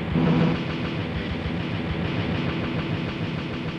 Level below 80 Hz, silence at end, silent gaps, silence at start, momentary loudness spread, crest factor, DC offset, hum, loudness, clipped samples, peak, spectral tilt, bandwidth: -40 dBFS; 0 s; none; 0 s; 7 LU; 16 dB; under 0.1%; none; -26 LUFS; under 0.1%; -10 dBFS; -8 dB/octave; 7.2 kHz